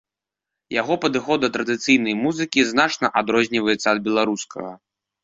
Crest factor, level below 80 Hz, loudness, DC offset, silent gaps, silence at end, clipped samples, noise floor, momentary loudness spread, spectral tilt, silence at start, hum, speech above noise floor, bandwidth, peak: 18 dB; -60 dBFS; -20 LUFS; under 0.1%; none; 0.45 s; under 0.1%; -86 dBFS; 8 LU; -3.5 dB/octave; 0.7 s; none; 66 dB; 7.8 kHz; -2 dBFS